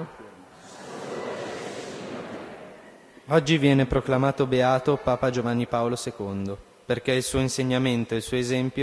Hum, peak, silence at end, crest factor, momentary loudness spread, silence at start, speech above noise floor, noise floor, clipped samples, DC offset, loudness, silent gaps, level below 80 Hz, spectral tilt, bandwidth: none; -6 dBFS; 0 s; 20 dB; 18 LU; 0 s; 25 dB; -49 dBFS; under 0.1%; under 0.1%; -25 LUFS; none; -48 dBFS; -5.5 dB/octave; 11 kHz